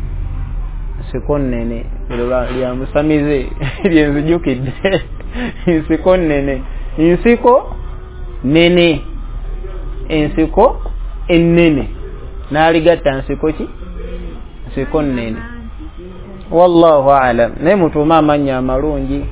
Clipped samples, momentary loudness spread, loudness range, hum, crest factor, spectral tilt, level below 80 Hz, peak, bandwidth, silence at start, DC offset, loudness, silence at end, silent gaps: 0.2%; 19 LU; 6 LU; none; 14 dB; -11 dB/octave; -24 dBFS; 0 dBFS; 4 kHz; 0 s; under 0.1%; -14 LUFS; 0 s; none